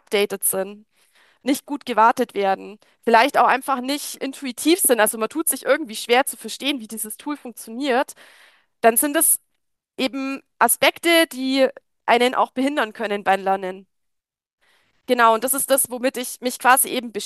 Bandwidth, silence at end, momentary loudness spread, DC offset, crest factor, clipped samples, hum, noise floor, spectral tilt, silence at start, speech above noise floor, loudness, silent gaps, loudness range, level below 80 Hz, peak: 13 kHz; 0 s; 12 LU; under 0.1%; 20 dB; under 0.1%; none; -78 dBFS; -1.5 dB/octave; 0.1 s; 58 dB; -20 LUFS; 14.53-14.58 s; 4 LU; -74 dBFS; 0 dBFS